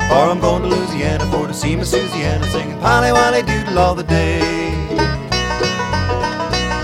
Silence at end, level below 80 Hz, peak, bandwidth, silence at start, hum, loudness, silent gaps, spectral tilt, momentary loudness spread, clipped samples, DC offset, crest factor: 0 s; -28 dBFS; 0 dBFS; 16 kHz; 0 s; none; -16 LUFS; none; -5 dB/octave; 6 LU; under 0.1%; under 0.1%; 16 dB